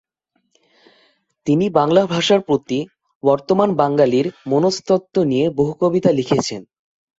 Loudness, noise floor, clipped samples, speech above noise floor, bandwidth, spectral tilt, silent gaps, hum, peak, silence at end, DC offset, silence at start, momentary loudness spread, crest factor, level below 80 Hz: -17 LUFS; -69 dBFS; under 0.1%; 53 dB; 8 kHz; -6 dB/octave; 3.15-3.20 s; none; -2 dBFS; 0.55 s; under 0.1%; 1.45 s; 8 LU; 16 dB; -58 dBFS